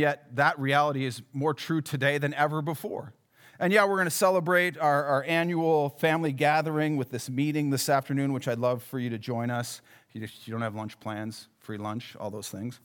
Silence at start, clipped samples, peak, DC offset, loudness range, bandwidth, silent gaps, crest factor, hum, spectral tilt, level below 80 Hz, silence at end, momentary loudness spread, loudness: 0 s; under 0.1%; -8 dBFS; under 0.1%; 10 LU; over 20 kHz; none; 20 dB; none; -5 dB/octave; -82 dBFS; 0.1 s; 14 LU; -27 LUFS